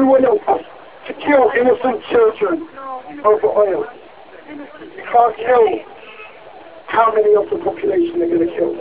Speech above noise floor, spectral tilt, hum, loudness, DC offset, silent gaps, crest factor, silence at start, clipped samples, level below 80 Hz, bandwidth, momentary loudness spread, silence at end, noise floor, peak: 24 dB; -9 dB/octave; none; -16 LUFS; 0.4%; none; 16 dB; 0 s; under 0.1%; -54 dBFS; 4 kHz; 21 LU; 0 s; -39 dBFS; 0 dBFS